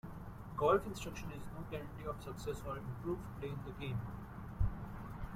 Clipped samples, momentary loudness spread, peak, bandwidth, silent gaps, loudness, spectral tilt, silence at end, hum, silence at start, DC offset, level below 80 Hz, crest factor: under 0.1%; 14 LU; -18 dBFS; 16 kHz; none; -42 LUFS; -6.5 dB/octave; 0 s; none; 0.05 s; under 0.1%; -50 dBFS; 22 dB